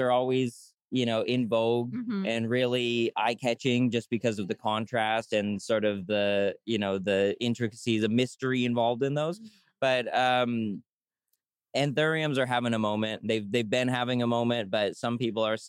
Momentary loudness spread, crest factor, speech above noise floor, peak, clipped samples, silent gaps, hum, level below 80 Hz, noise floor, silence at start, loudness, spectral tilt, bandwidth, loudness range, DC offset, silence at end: 5 LU; 14 dB; 53 dB; -14 dBFS; under 0.1%; 0.74-0.78 s, 10.92-10.97 s; none; -76 dBFS; -81 dBFS; 0 s; -28 LUFS; -5.5 dB/octave; 12 kHz; 1 LU; under 0.1%; 0 s